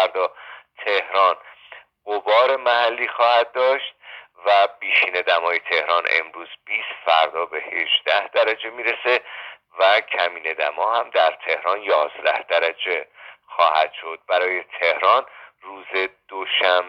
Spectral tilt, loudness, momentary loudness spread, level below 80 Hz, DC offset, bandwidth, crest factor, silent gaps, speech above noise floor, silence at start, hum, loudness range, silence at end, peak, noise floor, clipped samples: -2 dB/octave; -20 LUFS; 14 LU; -76 dBFS; under 0.1%; 6.4 kHz; 18 dB; none; 25 dB; 0 s; none; 2 LU; 0 s; -2 dBFS; -46 dBFS; under 0.1%